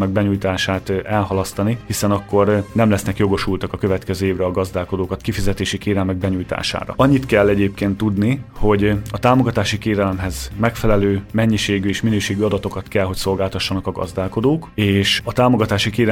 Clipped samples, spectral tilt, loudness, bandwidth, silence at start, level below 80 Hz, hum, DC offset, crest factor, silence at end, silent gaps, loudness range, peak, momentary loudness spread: under 0.1%; -6 dB/octave; -18 LUFS; 16.5 kHz; 0 s; -34 dBFS; none; under 0.1%; 16 dB; 0 s; none; 3 LU; 0 dBFS; 6 LU